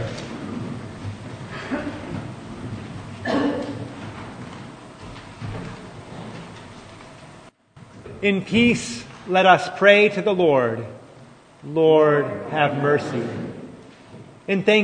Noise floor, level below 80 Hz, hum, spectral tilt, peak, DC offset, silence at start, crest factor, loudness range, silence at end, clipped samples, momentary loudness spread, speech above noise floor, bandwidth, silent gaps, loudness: -47 dBFS; -54 dBFS; none; -5.5 dB/octave; 0 dBFS; under 0.1%; 0 s; 22 dB; 18 LU; 0 s; under 0.1%; 24 LU; 29 dB; 9.6 kHz; none; -20 LUFS